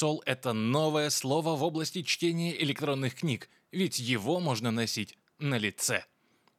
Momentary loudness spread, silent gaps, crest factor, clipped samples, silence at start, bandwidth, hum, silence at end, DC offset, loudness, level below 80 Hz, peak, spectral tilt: 6 LU; none; 20 dB; under 0.1%; 0 s; 16.5 kHz; none; 0.55 s; under 0.1%; -30 LUFS; -80 dBFS; -12 dBFS; -4 dB/octave